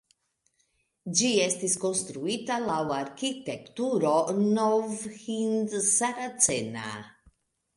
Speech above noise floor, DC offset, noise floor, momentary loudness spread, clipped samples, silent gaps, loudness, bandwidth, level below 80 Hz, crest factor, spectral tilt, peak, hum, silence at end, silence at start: 45 dB; under 0.1%; -73 dBFS; 12 LU; under 0.1%; none; -27 LUFS; 11.5 kHz; -68 dBFS; 20 dB; -3 dB/octave; -8 dBFS; none; 0.65 s; 1.05 s